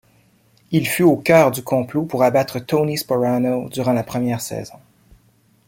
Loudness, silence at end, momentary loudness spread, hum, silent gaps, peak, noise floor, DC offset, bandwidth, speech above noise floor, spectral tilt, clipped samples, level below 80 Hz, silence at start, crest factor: -18 LUFS; 1 s; 9 LU; none; none; -2 dBFS; -57 dBFS; under 0.1%; 17 kHz; 39 dB; -6 dB/octave; under 0.1%; -56 dBFS; 0.7 s; 18 dB